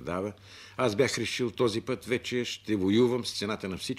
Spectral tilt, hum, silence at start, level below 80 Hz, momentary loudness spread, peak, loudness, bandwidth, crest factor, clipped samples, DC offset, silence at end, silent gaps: -5 dB/octave; none; 0 s; -62 dBFS; 9 LU; -12 dBFS; -29 LUFS; 15 kHz; 18 dB; under 0.1%; under 0.1%; 0 s; none